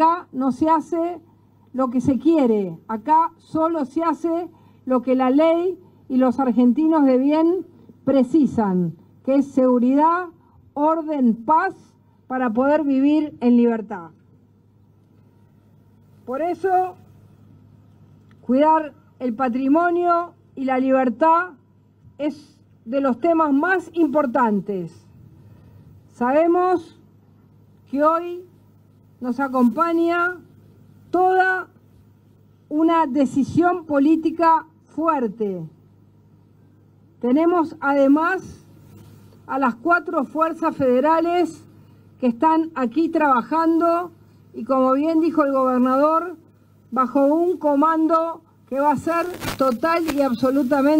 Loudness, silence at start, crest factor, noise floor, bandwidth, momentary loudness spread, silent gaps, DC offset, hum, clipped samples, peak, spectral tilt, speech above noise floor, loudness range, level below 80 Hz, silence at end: -20 LUFS; 0 s; 16 dB; -54 dBFS; 16 kHz; 12 LU; none; under 0.1%; none; under 0.1%; -6 dBFS; -7 dB/octave; 36 dB; 4 LU; -60 dBFS; 0 s